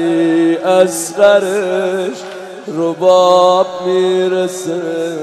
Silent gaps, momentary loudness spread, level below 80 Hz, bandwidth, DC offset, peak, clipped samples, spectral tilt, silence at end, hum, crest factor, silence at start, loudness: none; 11 LU; -64 dBFS; 13.5 kHz; under 0.1%; 0 dBFS; under 0.1%; -4.5 dB/octave; 0 s; none; 12 dB; 0 s; -13 LUFS